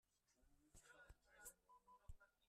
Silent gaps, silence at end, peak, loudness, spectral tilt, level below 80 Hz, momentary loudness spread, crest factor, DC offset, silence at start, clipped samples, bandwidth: none; 0 s; -44 dBFS; -66 LUFS; -2.5 dB/octave; -72 dBFS; 6 LU; 24 dB; under 0.1%; 0.05 s; under 0.1%; 13.5 kHz